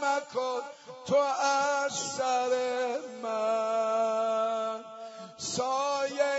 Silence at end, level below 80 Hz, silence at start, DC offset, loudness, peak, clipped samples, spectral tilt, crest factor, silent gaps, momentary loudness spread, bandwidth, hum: 0 s; -78 dBFS; 0 s; under 0.1%; -29 LUFS; -14 dBFS; under 0.1%; -2.5 dB/octave; 16 dB; none; 11 LU; 8 kHz; none